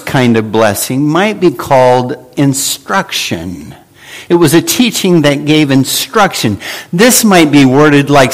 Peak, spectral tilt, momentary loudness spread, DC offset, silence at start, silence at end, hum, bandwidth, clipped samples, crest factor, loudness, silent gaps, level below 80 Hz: 0 dBFS; -4.5 dB/octave; 10 LU; under 0.1%; 0 s; 0 s; none; over 20 kHz; 0.6%; 10 dB; -9 LUFS; none; -44 dBFS